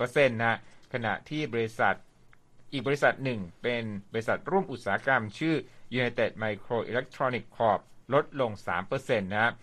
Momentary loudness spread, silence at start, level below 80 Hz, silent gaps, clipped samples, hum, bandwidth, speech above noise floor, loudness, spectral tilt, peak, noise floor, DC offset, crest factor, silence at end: 8 LU; 0 s; -60 dBFS; none; under 0.1%; none; 13 kHz; 27 dB; -30 LUFS; -6 dB/octave; -8 dBFS; -56 dBFS; under 0.1%; 20 dB; 0 s